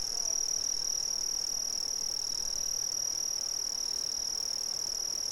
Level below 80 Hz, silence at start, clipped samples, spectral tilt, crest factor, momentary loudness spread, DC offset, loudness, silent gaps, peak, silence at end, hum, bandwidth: -58 dBFS; 0 s; under 0.1%; 1.5 dB/octave; 12 dB; 2 LU; under 0.1%; -30 LUFS; none; -22 dBFS; 0 s; none; 18 kHz